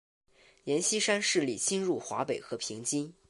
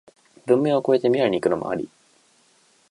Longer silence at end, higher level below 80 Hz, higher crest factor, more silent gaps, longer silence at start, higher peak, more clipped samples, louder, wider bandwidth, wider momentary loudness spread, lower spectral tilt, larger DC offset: second, 0.2 s vs 1.05 s; second, -74 dBFS vs -64 dBFS; about the same, 18 dB vs 18 dB; neither; first, 0.65 s vs 0.45 s; second, -14 dBFS vs -4 dBFS; neither; second, -30 LUFS vs -21 LUFS; about the same, 11.5 kHz vs 11.5 kHz; second, 8 LU vs 13 LU; second, -2.5 dB/octave vs -7 dB/octave; neither